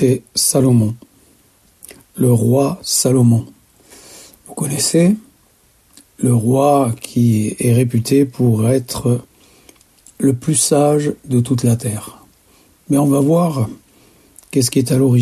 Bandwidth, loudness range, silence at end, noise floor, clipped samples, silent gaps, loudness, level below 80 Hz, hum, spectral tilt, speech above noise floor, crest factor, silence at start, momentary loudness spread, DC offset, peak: 14 kHz; 3 LU; 0 s; -54 dBFS; under 0.1%; none; -15 LUFS; -50 dBFS; none; -6 dB/octave; 40 dB; 14 dB; 0 s; 9 LU; under 0.1%; -2 dBFS